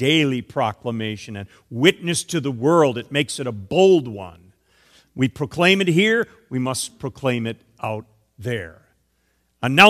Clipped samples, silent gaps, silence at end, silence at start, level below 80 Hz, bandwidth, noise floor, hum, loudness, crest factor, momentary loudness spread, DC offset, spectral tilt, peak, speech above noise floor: under 0.1%; none; 0 s; 0 s; -58 dBFS; 15 kHz; -66 dBFS; none; -20 LUFS; 20 dB; 17 LU; under 0.1%; -4.5 dB/octave; 0 dBFS; 47 dB